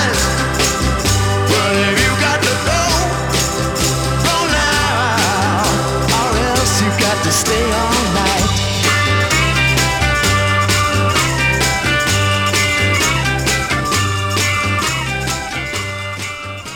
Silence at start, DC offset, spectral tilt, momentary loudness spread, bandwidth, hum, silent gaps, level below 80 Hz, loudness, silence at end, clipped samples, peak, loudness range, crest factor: 0 s; under 0.1%; -3.5 dB/octave; 4 LU; 19 kHz; none; none; -28 dBFS; -14 LUFS; 0 s; under 0.1%; -2 dBFS; 2 LU; 12 dB